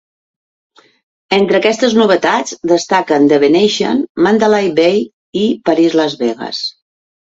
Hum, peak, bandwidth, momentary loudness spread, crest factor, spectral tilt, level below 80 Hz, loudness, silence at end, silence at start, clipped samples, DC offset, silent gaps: none; 0 dBFS; 8 kHz; 8 LU; 14 dB; -4.5 dB/octave; -56 dBFS; -13 LUFS; 0.65 s; 1.3 s; under 0.1%; under 0.1%; 4.09-4.15 s, 5.13-5.33 s